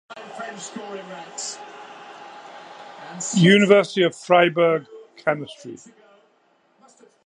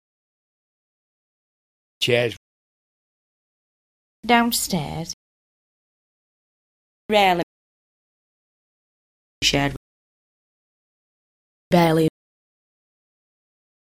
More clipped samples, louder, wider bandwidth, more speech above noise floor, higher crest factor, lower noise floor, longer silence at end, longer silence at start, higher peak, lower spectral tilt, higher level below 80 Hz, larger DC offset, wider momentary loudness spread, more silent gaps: neither; about the same, -19 LUFS vs -20 LUFS; second, 10.5 kHz vs 16 kHz; second, 42 dB vs over 71 dB; about the same, 22 dB vs 24 dB; second, -62 dBFS vs under -90 dBFS; second, 1.5 s vs 1.85 s; second, 0.1 s vs 2 s; first, 0 dBFS vs -4 dBFS; about the same, -5 dB/octave vs -4 dB/octave; second, -74 dBFS vs -52 dBFS; neither; first, 25 LU vs 17 LU; second, none vs 2.37-4.23 s, 5.13-7.09 s, 7.43-9.41 s, 9.77-11.71 s